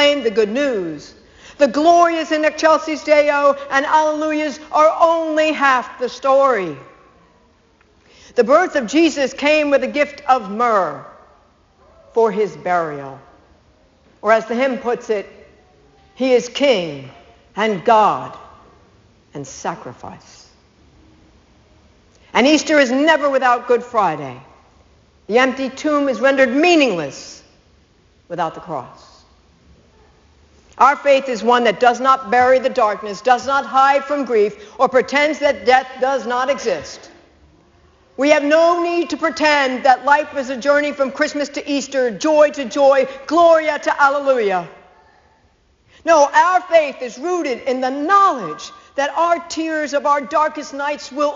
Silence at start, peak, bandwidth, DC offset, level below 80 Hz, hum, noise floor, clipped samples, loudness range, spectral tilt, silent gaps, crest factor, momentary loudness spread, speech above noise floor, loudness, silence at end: 0 s; 0 dBFS; 7.6 kHz; under 0.1%; -56 dBFS; none; -56 dBFS; under 0.1%; 6 LU; -2 dB/octave; none; 18 dB; 13 LU; 40 dB; -16 LUFS; 0 s